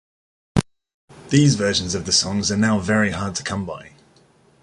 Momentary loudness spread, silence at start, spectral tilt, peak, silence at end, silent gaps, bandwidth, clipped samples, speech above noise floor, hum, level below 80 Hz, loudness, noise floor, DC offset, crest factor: 11 LU; 0.55 s; -4 dB/octave; -2 dBFS; 0.75 s; 0.94-1.08 s; 11.5 kHz; under 0.1%; 36 dB; none; -44 dBFS; -20 LUFS; -55 dBFS; under 0.1%; 20 dB